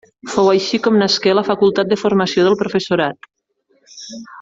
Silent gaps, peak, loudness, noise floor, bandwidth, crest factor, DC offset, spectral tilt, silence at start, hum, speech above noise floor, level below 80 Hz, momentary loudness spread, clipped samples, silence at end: none; -2 dBFS; -15 LUFS; -62 dBFS; 7.8 kHz; 14 dB; under 0.1%; -5 dB/octave; 0.25 s; none; 46 dB; -58 dBFS; 15 LU; under 0.1%; 0 s